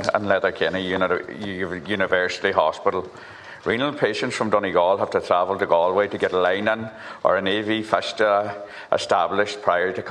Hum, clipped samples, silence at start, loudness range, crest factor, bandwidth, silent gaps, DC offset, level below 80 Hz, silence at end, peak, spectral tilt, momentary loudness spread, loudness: none; under 0.1%; 0 s; 3 LU; 20 dB; 10.5 kHz; none; under 0.1%; -60 dBFS; 0 s; -2 dBFS; -4.5 dB/octave; 9 LU; -22 LUFS